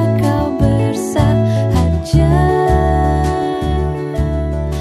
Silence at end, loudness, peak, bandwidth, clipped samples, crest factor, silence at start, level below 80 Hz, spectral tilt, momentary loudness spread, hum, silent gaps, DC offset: 0 s; -15 LUFS; -2 dBFS; 14 kHz; under 0.1%; 12 dB; 0 s; -22 dBFS; -7.5 dB/octave; 6 LU; none; none; under 0.1%